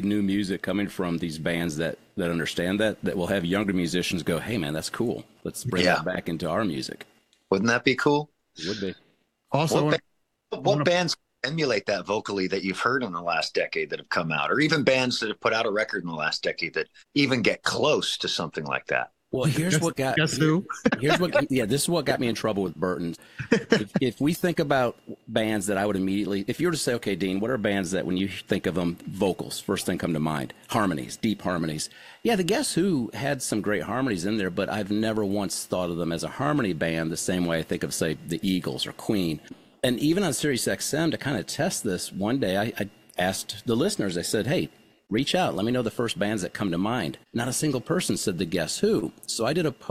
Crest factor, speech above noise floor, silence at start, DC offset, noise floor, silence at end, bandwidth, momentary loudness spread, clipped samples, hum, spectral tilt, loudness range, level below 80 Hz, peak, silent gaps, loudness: 22 dB; 27 dB; 0 s; under 0.1%; -53 dBFS; 0 s; 16 kHz; 7 LU; under 0.1%; none; -4.5 dB/octave; 3 LU; -58 dBFS; -4 dBFS; none; -26 LUFS